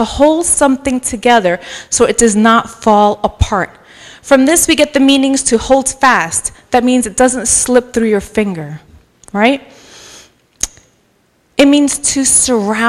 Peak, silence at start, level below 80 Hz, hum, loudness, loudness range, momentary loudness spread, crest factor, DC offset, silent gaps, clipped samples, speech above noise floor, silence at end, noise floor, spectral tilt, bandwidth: 0 dBFS; 0 s; -34 dBFS; none; -11 LUFS; 6 LU; 12 LU; 12 dB; under 0.1%; none; 0.3%; 44 dB; 0 s; -55 dBFS; -3 dB/octave; 15.5 kHz